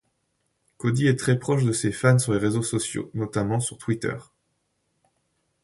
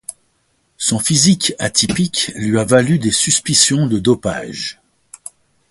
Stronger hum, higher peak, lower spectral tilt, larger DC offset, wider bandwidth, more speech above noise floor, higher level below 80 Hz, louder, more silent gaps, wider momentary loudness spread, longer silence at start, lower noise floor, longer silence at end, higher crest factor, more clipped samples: neither; second, -4 dBFS vs 0 dBFS; first, -5.5 dB/octave vs -3.5 dB/octave; neither; about the same, 11.5 kHz vs 12 kHz; about the same, 50 dB vs 47 dB; second, -56 dBFS vs -46 dBFS; second, -24 LUFS vs -14 LUFS; neither; second, 9 LU vs 17 LU; first, 0.8 s vs 0.1 s; first, -73 dBFS vs -62 dBFS; first, 1.4 s vs 1 s; first, 22 dB vs 16 dB; neither